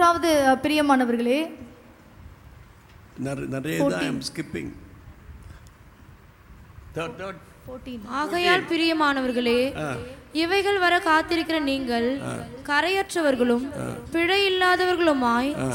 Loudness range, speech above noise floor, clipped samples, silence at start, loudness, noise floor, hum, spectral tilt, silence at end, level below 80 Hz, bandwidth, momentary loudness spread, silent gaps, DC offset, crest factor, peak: 13 LU; 26 dB; under 0.1%; 0 s; -23 LUFS; -49 dBFS; none; -4.5 dB/octave; 0 s; -50 dBFS; 17 kHz; 15 LU; none; under 0.1%; 18 dB; -6 dBFS